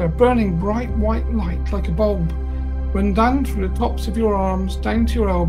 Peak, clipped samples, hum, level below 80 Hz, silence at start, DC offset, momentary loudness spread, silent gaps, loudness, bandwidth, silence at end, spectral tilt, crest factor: -2 dBFS; under 0.1%; none; -22 dBFS; 0 s; 0.7%; 7 LU; none; -20 LUFS; 12.5 kHz; 0 s; -8 dB/octave; 16 dB